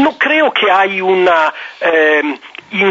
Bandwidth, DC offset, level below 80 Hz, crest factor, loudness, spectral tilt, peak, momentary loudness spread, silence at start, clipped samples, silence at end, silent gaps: 7.6 kHz; under 0.1%; -60 dBFS; 12 dB; -12 LUFS; -1 dB/octave; -2 dBFS; 9 LU; 0 s; under 0.1%; 0 s; none